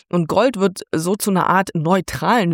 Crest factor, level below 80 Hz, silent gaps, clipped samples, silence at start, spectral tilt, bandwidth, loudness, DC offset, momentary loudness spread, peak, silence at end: 14 dB; -50 dBFS; none; under 0.1%; 0.15 s; -5.5 dB/octave; 17 kHz; -18 LUFS; under 0.1%; 5 LU; -4 dBFS; 0 s